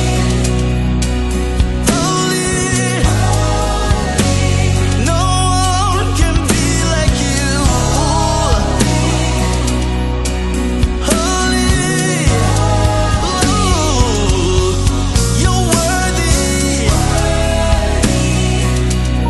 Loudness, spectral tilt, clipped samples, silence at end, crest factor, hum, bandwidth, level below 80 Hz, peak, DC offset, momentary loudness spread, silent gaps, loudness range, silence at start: -14 LUFS; -4.5 dB/octave; under 0.1%; 0 s; 12 dB; none; 12.5 kHz; -18 dBFS; 0 dBFS; under 0.1%; 3 LU; none; 1 LU; 0 s